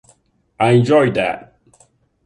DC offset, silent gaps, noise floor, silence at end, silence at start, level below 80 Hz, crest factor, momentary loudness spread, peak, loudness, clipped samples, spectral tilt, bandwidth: under 0.1%; none; -56 dBFS; 0.85 s; 0.6 s; -54 dBFS; 16 dB; 10 LU; -2 dBFS; -15 LUFS; under 0.1%; -7 dB/octave; 11 kHz